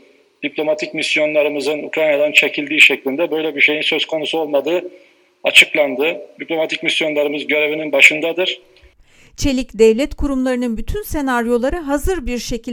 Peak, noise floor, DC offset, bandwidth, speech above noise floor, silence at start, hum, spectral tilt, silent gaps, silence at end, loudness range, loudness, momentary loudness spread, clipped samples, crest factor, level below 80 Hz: 0 dBFS; -48 dBFS; under 0.1%; 19 kHz; 32 dB; 0.4 s; none; -3 dB/octave; none; 0 s; 4 LU; -15 LUFS; 13 LU; 0.2%; 16 dB; -34 dBFS